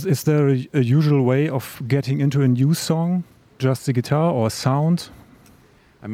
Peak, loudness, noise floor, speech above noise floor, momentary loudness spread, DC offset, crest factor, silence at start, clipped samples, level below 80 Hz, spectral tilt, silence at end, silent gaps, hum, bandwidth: -4 dBFS; -20 LUFS; -53 dBFS; 34 dB; 7 LU; under 0.1%; 14 dB; 0 s; under 0.1%; -60 dBFS; -7 dB/octave; 0 s; none; none; 16.5 kHz